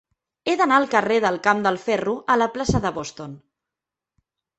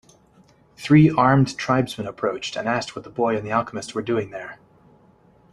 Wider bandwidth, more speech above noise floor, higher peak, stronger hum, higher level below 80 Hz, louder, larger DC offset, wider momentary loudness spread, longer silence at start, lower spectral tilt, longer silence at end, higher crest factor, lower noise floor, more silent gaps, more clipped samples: second, 8.4 kHz vs 12 kHz; first, 67 dB vs 34 dB; about the same, -2 dBFS vs -2 dBFS; neither; first, -48 dBFS vs -54 dBFS; about the same, -21 LUFS vs -21 LUFS; neither; about the same, 14 LU vs 16 LU; second, 0.45 s vs 0.8 s; second, -5 dB/octave vs -6.5 dB/octave; first, 1.2 s vs 1 s; about the same, 20 dB vs 20 dB; first, -88 dBFS vs -55 dBFS; neither; neither